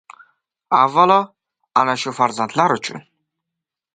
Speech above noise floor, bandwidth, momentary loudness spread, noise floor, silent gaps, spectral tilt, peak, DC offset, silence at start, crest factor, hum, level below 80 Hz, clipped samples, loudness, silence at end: 67 dB; 9.4 kHz; 14 LU; -83 dBFS; none; -4.5 dB/octave; 0 dBFS; under 0.1%; 0.7 s; 20 dB; none; -70 dBFS; under 0.1%; -17 LUFS; 0.95 s